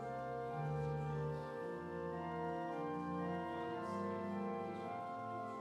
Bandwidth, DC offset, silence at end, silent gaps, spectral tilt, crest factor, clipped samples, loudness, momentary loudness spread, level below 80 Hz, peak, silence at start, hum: 11 kHz; under 0.1%; 0 s; none; -8 dB/octave; 14 dB; under 0.1%; -43 LUFS; 4 LU; -68 dBFS; -30 dBFS; 0 s; none